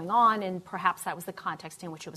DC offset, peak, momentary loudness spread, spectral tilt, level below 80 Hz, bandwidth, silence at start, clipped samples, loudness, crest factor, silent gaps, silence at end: under 0.1%; -10 dBFS; 16 LU; -4.5 dB/octave; -74 dBFS; 14 kHz; 0 s; under 0.1%; -29 LUFS; 20 dB; none; 0 s